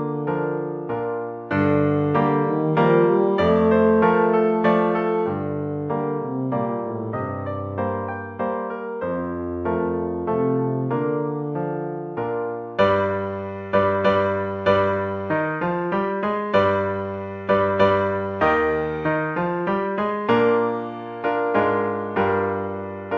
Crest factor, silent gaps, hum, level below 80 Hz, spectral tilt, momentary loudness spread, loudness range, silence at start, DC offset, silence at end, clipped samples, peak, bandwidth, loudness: 18 dB; none; none; -48 dBFS; -9 dB/octave; 10 LU; 8 LU; 0 s; under 0.1%; 0 s; under 0.1%; -4 dBFS; 6.2 kHz; -22 LUFS